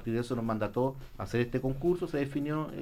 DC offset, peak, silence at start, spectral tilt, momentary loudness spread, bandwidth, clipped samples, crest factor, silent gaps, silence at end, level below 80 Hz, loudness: under 0.1%; -18 dBFS; 0 s; -7.5 dB/octave; 4 LU; 16 kHz; under 0.1%; 14 dB; none; 0 s; -48 dBFS; -32 LUFS